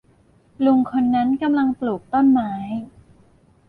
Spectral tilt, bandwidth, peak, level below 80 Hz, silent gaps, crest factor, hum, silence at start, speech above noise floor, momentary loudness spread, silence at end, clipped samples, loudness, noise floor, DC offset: -8.5 dB/octave; 4.6 kHz; -8 dBFS; -56 dBFS; none; 12 dB; none; 0.6 s; 37 dB; 11 LU; 0.8 s; under 0.1%; -20 LUFS; -56 dBFS; under 0.1%